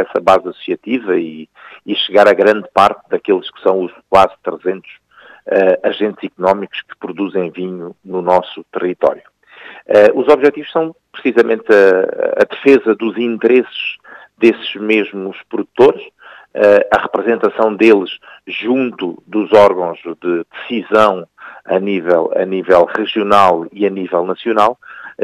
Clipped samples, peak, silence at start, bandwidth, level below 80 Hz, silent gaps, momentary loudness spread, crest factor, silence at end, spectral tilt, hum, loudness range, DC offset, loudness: 0.2%; 0 dBFS; 0 s; 11 kHz; -56 dBFS; none; 15 LU; 14 dB; 0 s; -6 dB/octave; none; 5 LU; under 0.1%; -14 LUFS